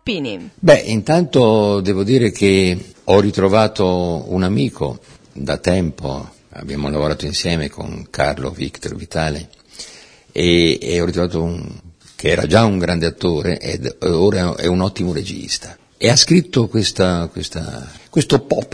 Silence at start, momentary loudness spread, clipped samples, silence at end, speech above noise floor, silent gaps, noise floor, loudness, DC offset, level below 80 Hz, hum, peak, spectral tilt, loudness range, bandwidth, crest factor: 0.05 s; 15 LU; under 0.1%; 0.05 s; 25 dB; none; -41 dBFS; -17 LUFS; under 0.1%; -38 dBFS; none; 0 dBFS; -5 dB/octave; 7 LU; 11 kHz; 16 dB